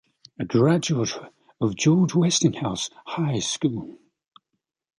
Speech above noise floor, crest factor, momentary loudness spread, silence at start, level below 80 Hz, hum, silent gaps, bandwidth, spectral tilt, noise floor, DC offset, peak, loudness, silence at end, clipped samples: 58 dB; 18 dB; 12 LU; 0.4 s; -58 dBFS; none; none; 11.5 kHz; -5 dB/octave; -80 dBFS; under 0.1%; -6 dBFS; -23 LUFS; 1.05 s; under 0.1%